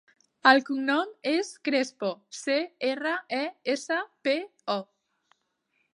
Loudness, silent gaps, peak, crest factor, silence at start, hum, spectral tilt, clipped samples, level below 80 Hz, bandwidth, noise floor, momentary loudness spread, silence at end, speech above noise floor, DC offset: -27 LUFS; none; -4 dBFS; 26 dB; 0.45 s; none; -3 dB/octave; under 0.1%; -86 dBFS; 11 kHz; -75 dBFS; 11 LU; 1.1 s; 48 dB; under 0.1%